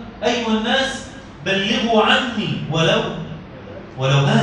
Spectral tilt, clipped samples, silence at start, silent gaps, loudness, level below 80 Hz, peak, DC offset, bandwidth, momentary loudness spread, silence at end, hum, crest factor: -5 dB/octave; under 0.1%; 0 s; none; -18 LUFS; -46 dBFS; -2 dBFS; under 0.1%; 9.8 kHz; 19 LU; 0 s; none; 18 dB